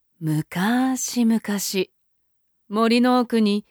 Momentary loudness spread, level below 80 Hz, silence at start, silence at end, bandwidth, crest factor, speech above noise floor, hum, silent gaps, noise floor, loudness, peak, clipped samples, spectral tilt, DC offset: 8 LU; -70 dBFS; 0.2 s; 0.1 s; over 20 kHz; 14 dB; 46 dB; none; none; -66 dBFS; -21 LUFS; -8 dBFS; under 0.1%; -4.5 dB/octave; under 0.1%